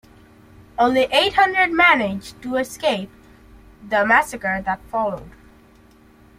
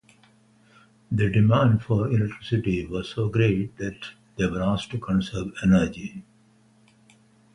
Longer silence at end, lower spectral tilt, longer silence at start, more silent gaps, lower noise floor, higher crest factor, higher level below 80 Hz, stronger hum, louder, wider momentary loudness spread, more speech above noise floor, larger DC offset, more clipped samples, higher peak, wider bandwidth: second, 1.1 s vs 1.35 s; second, -3.5 dB/octave vs -7.5 dB/octave; second, 0.8 s vs 1.1 s; neither; second, -50 dBFS vs -59 dBFS; about the same, 20 dB vs 18 dB; about the same, -50 dBFS vs -46 dBFS; neither; first, -18 LUFS vs -24 LUFS; about the same, 13 LU vs 13 LU; second, 31 dB vs 36 dB; neither; neither; first, -2 dBFS vs -8 dBFS; first, 16 kHz vs 10.5 kHz